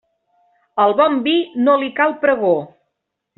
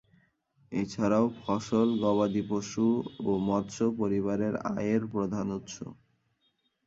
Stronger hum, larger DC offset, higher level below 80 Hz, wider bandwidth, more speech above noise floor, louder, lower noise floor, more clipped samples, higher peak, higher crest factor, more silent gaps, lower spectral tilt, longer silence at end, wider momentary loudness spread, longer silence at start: neither; neither; about the same, -66 dBFS vs -62 dBFS; second, 4.2 kHz vs 7.8 kHz; first, 61 dB vs 46 dB; first, -16 LUFS vs -30 LUFS; about the same, -76 dBFS vs -74 dBFS; neither; first, -2 dBFS vs -12 dBFS; about the same, 16 dB vs 18 dB; neither; second, -2 dB/octave vs -6.5 dB/octave; second, 0.7 s vs 0.95 s; second, 4 LU vs 9 LU; about the same, 0.75 s vs 0.7 s